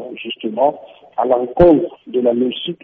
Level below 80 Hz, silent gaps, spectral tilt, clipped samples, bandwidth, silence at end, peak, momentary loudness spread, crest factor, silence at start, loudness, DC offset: -38 dBFS; none; -5 dB/octave; under 0.1%; 4.3 kHz; 0.1 s; -2 dBFS; 13 LU; 16 dB; 0 s; -16 LUFS; under 0.1%